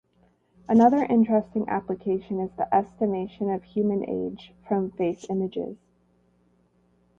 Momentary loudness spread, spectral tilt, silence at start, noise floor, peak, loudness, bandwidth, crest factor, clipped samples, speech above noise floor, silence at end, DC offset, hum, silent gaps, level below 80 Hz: 12 LU; -8.5 dB/octave; 0.7 s; -64 dBFS; -6 dBFS; -25 LUFS; 7.4 kHz; 20 dB; under 0.1%; 40 dB; 1.45 s; under 0.1%; 60 Hz at -50 dBFS; none; -62 dBFS